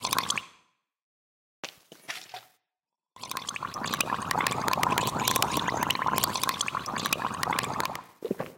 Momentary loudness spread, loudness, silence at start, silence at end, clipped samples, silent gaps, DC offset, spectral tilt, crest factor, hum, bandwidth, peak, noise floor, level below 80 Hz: 17 LU; -29 LUFS; 0 s; 0 s; under 0.1%; 1.03-1.63 s; under 0.1%; -2 dB/octave; 24 dB; none; 17 kHz; -6 dBFS; under -90 dBFS; -60 dBFS